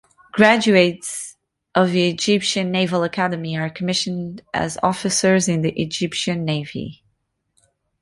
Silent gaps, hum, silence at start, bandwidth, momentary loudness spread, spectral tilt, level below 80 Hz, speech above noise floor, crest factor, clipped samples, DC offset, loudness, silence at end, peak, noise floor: none; none; 0.35 s; 11.5 kHz; 13 LU; -4.5 dB/octave; -56 dBFS; 51 dB; 20 dB; under 0.1%; under 0.1%; -19 LUFS; 1.05 s; 0 dBFS; -70 dBFS